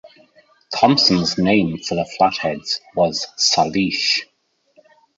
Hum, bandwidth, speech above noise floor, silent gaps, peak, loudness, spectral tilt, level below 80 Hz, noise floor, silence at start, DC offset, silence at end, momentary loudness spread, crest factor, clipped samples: none; 8 kHz; 41 dB; none; -2 dBFS; -18 LUFS; -4 dB/octave; -52 dBFS; -59 dBFS; 0.05 s; under 0.1%; 0.95 s; 10 LU; 18 dB; under 0.1%